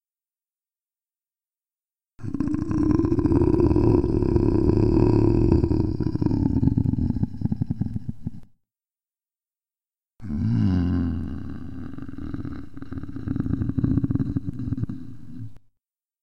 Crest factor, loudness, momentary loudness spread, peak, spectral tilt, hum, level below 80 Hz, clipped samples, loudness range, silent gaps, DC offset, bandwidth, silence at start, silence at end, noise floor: 20 dB; -23 LUFS; 17 LU; -4 dBFS; -10.5 dB/octave; none; -34 dBFS; under 0.1%; 9 LU; none; 1%; 6 kHz; 0 s; 0 s; under -90 dBFS